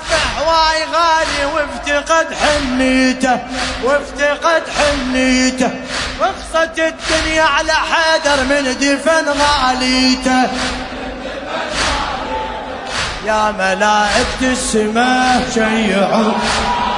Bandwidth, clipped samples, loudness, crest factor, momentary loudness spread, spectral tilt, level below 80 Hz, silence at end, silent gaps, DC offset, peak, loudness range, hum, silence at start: 11 kHz; under 0.1%; -14 LUFS; 14 dB; 8 LU; -3 dB/octave; -34 dBFS; 0 s; none; under 0.1%; 0 dBFS; 4 LU; none; 0 s